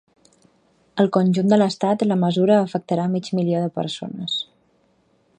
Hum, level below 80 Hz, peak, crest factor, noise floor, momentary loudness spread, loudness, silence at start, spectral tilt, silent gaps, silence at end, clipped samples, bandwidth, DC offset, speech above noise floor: none; -66 dBFS; -4 dBFS; 18 dB; -62 dBFS; 10 LU; -20 LUFS; 0.95 s; -7 dB/octave; none; 0.95 s; under 0.1%; 9.4 kHz; under 0.1%; 43 dB